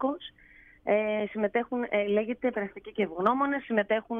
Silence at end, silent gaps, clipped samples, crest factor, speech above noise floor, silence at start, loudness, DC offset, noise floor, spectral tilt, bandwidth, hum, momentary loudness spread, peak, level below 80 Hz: 0 s; none; under 0.1%; 18 dB; 27 dB; 0 s; -29 LUFS; under 0.1%; -56 dBFS; -8 dB/octave; 3.9 kHz; none; 9 LU; -12 dBFS; -64 dBFS